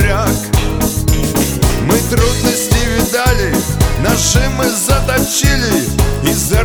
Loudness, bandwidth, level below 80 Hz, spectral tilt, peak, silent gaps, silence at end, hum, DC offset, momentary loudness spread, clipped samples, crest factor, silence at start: -13 LUFS; over 20 kHz; -18 dBFS; -4 dB/octave; 0 dBFS; none; 0 s; none; under 0.1%; 3 LU; under 0.1%; 12 dB; 0 s